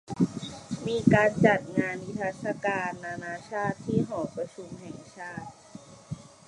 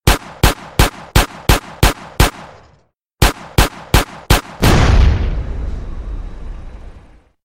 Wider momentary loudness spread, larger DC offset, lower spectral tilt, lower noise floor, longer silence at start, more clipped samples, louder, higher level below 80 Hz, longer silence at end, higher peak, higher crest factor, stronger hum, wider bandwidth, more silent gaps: first, 21 LU vs 18 LU; neither; first, -6.5 dB/octave vs -4.5 dB/octave; second, -49 dBFS vs -55 dBFS; about the same, 0.1 s vs 0.05 s; neither; second, -28 LUFS vs -15 LUFS; second, -58 dBFS vs -18 dBFS; second, 0.25 s vs 0.45 s; second, -6 dBFS vs 0 dBFS; first, 24 dB vs 16 dB; neither; second, 11 kHz vs 16.5 kHz; neither